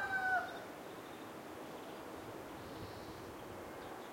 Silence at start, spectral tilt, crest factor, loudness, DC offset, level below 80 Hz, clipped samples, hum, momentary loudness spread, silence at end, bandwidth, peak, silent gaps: 0 s; -4 dB/octave; 20 dB; -45 LUFS; under 0.1%; -70 dBFS; under 0.1%; none; 13 LU; 0 s; 16.5 kHz; -24 dBFS; none